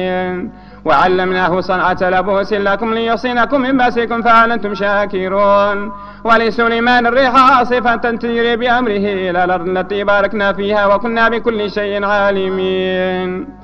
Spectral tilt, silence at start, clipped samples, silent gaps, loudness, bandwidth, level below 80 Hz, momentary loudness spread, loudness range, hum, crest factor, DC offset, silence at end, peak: -6.5 dB/octave; 0 s; under 0.1%; none; -14 LUFS; 8.6 kHz; -40 dBFS; 7 LU; 3 LU; 50 Hz at -35 dBFS; 14 dB; under 0.1%; 0 s; 0 dBFS